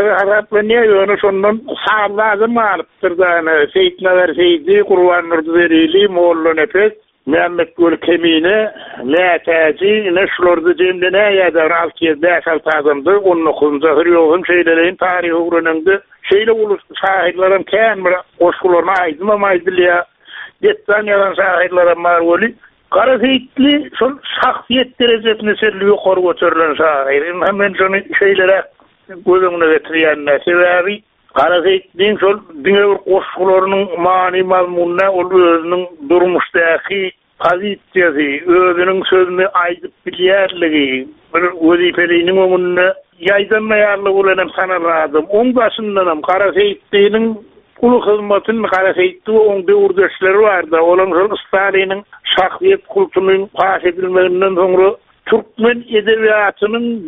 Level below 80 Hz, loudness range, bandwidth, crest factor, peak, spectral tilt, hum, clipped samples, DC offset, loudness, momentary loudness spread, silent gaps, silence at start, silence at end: -52 dBFS; 2 LU; 4 kHz; 12 dB; 0 dBFS; -2 dB/octave; none; under 0.1%; under 0.1%; -12 LUFS; 5 LU; none; 0 s; 0 s